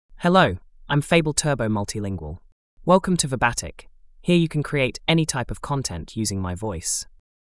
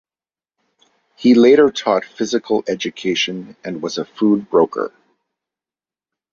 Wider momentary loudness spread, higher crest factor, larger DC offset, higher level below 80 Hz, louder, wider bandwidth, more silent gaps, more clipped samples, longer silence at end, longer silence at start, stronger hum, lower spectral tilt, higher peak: second, 12 LU vs 15 LU; about the same, 20 dB vs 16 dB; neither; first, -44 dBFS vs -62 dBFS; second, -22 LUFS vs -17 LUFS; first, 12 kHz vs 7.2 kHz; first, 2.52-2.77 s vs none; neither; second, 0.4 s vs 1.45 s; second, 0.1 s vs 1.2 s; neither; about the same, -4.5 dB/octave vs -5 dB/octave; about the same, -4 dBFS vs -2 dBFS